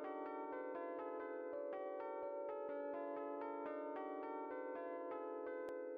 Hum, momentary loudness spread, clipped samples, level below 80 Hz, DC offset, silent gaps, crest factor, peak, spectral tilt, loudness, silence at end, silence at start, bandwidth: none; 1 LU; under 0.1%; under -90 dBFS; under 0.1%; none; 8 dB; -38 dBFS; -3.5 dB/octave; -47 LUFS; 0 s; 0 s; 5.2 kHz